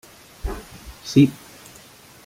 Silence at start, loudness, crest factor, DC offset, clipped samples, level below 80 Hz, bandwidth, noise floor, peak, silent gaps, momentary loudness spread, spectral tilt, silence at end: 0.45 s; -20 LUFS; 22 dB; under 0.1%; under 0.1%; -40 dBFS; 16 kHz; -47 dBFS; -2 dBFS; none; 25 LU; -6.5 dB/octave; 0.9 s